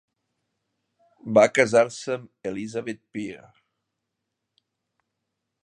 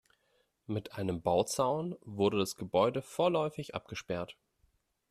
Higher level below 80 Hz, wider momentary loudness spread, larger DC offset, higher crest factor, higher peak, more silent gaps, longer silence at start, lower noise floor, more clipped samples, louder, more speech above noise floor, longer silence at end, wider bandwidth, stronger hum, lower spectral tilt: about the same, -70 dBFS vs -66 dBFS; first, 17 LU vs 11 LU; neither; about the same, 24 dB vs 20 dB; first, -2 dBFS vs -14 dBFS; neither; first, 1.25 s vs 0.7 s; first, -82 dBFS vs -75 dBFS; neither; first, -23 LUFS vs -33 LUFS; first, 59 dB vs 42 dB; first, 2.3 s vs 0.8 s; second, 10.5 kHz vs 14 kHz; neither; about the same, -4.5 dB/octave vs -5 dB/octave